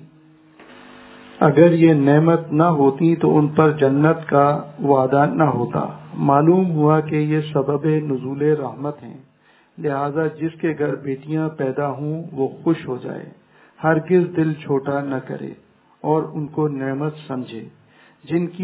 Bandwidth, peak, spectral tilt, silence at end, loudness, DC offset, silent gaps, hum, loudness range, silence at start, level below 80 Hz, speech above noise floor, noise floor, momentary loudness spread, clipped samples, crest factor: 4 kHz; 0 dBFS; -12.5 dB/octave; 0 s; -19 LUFS; under 0.1%; none; none; 9 LU; 0.7 s; -60 dBFS; 37 dB; -55 dBFS; 14 LU; under 0.1%; 18 dB